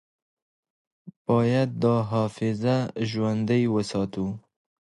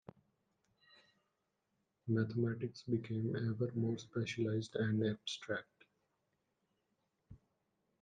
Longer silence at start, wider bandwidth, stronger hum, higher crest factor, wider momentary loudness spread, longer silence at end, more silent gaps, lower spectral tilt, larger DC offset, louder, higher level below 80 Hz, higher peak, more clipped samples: second, 1.05 s vs 2.05 s; first, 11 kHz vs 9.2 kHz; neither; about the same, 18 dB vs 18 dB; about the same, 8 LU vs 7 LU; about the same, 0.6 s vs 0.65 s; first, 1.16-1.25 s vs none; about the same, -7.5 dB/octave vs -6.5 dB/octave; neither; first, -25 LUFS vs -39 LUFS; first, -58 dBFS vs -78 dBFS; first, -8 dBFS vs -22 dBFS; neither